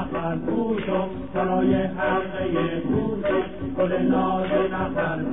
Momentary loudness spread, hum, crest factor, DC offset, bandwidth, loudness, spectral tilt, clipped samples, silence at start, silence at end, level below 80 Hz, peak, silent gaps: 5 LU; none; 14 dB; 0.9%; 3.9 kHz; -24 LUFS; -11.5 dB/octave; under 0.1%; 0 s; 0 s; -46 dBFS; -10 dBFS; none